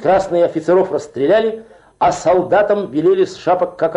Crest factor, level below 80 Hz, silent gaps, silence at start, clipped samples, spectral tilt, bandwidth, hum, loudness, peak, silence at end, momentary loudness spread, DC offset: 10 dB; -50 dBFS; none; 0 s; under 0.1%; -6 dB/octave; 10.5 kHz; none; -15 LUFS; -4 dBFS; 0 s; 5 LU; under 0.1%